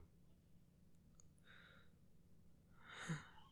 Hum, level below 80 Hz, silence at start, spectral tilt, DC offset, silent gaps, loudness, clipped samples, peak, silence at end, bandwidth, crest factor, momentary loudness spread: none; -76 dBFS; 0 s; -4.5 dB/octave; under 0.1%; none; -53 LUFS; under 0.1%; -34 dBFS; 0 s; 13 kHz; 24 dB; 19 LU